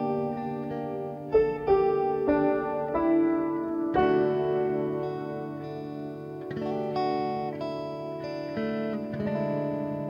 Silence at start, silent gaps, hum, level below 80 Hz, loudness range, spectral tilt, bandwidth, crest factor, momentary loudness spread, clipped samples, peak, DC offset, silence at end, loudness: 0 s; none; none; -56 dBFS; 7 LU; -9 dB/octave; 6.6 kHz; 16 dB; 11 LU; under 0.1%; -12 dBFS; under 0.1%; 0 s; -29 LUFS